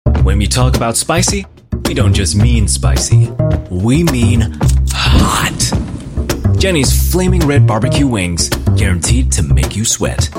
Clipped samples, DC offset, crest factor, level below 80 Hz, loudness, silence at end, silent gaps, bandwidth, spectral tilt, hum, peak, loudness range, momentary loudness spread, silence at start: under 0.1%; under 0.1%; 12 dB; -18 dBFS; -13 LUFS; 0 s; none; 16.5 kHz; -5 dB/octave; none; 0 dBFS; 1 LU; 5 LU; 0.05 s